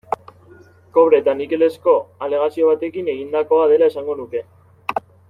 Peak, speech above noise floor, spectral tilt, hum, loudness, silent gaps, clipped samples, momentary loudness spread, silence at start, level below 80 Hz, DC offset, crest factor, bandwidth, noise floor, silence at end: -2 dBFS; 30 dB; -7 dB/octave; none; -18 LUFS; none; under 0.1%; 14 LU; 0.1 s; -64 dBFS; under 0.1%; 16 dB; 5.4 kHz; -46 dBFS; 0.3 s